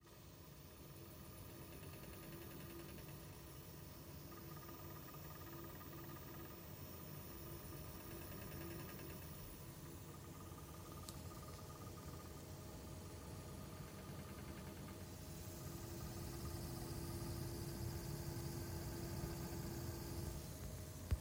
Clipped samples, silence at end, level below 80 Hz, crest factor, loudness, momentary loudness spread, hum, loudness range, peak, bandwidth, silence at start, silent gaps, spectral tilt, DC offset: under 0.1%; 0 s; -60 dBFS; 22 dB; -52 LUFS; 7 LU; none; 6 LU; -28 dBFS; 16.5 kHz; 0 s; none; -5 dB/octave; under 0.1%